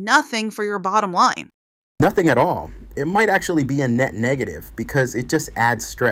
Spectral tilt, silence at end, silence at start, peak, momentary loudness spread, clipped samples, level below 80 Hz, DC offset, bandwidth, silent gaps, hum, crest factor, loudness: -5 dB/octave; 0 s; 0 s; -2 dBFS; 9 LU; under 0.1%; -46 dBFS; under 0.1%; 16.5 kHz; 1.54-1.96 s; none; 18 dB; -20 LUFS